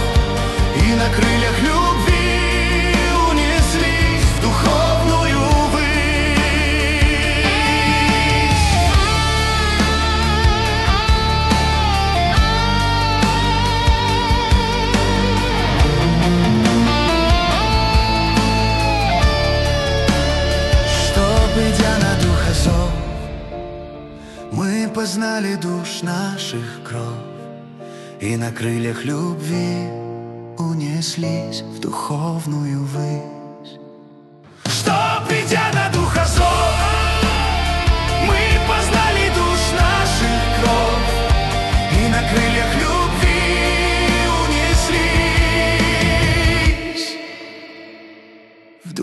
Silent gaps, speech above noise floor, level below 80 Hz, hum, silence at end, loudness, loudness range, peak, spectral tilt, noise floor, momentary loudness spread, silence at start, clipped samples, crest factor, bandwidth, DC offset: none; 25 dB; -22 dBFS; none; 0 s; -16 LUFS; 8 LU; -4 dBFS; -4.5 dB/octave; -45 dBFS; 11 LU; 0 s; under 0.1%; 14 dB; 12.5 kHz; under 0.1%